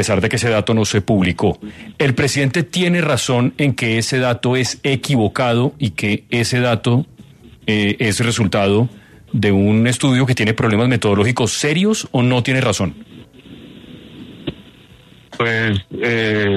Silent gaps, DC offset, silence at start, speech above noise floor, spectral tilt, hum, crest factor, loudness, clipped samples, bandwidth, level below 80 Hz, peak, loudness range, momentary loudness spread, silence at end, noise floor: none; under 0.1%; 0 s; 29 dB; -5 dB/octave; none; 16 dB; -16 LUFS; under 0.1%; 13.5 kHz; -46 dBFS; -2 dBFS; 6 LU; 6 LU; 0 s; -45 dBFS